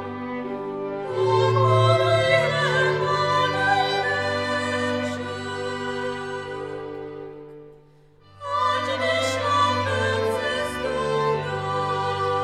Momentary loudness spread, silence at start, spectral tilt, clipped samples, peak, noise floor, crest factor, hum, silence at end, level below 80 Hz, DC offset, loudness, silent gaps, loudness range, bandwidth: 13 LU; 0 s; -5 dB/octave; under 0.1%; -6 dBFS; -53 dBFS; 18 dB; none; 0 s; -56 dBFS; under 0.1%; -23 LUFS; none; 10 LU; 14 kHz